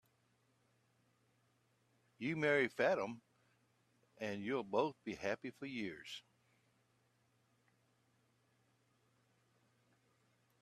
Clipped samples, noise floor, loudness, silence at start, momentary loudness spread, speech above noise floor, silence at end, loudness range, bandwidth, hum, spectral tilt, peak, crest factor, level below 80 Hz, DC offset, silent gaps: under 0.1%; -78 dBFS; -40 LUFS; 2.2 s; 15 LU; 38 dB; 4.4 s; 13 LU; 13.5 kHz; none; -5.5 dB/octave; -20 dBFS; 24 dB; -84 dBFS; under 0.1%; none